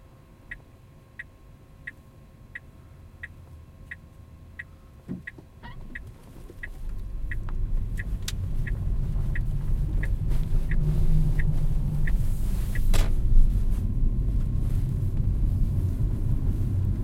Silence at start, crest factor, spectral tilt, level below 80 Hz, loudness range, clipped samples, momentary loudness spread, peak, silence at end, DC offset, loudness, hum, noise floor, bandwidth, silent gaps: 0.5 s; 18 dB; -6.5 dB/octave; -26 dBFS; 17 LU; under 0.1%; 18 LU; -6 dBFS; 0 s; under 0.1%; -29 LUFS; none; -51 dBFS; 12.5 kHz; none